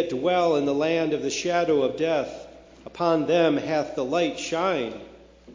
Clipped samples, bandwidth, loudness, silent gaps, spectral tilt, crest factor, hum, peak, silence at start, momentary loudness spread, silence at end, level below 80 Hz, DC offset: under 0.1%; 7.6 kHz; -24 LUFS; none; -5 dB/octave; 16 dB; none; -8 dBFS; 0 s; 9 LU; 0 s; -58 dBFS; under 0.1%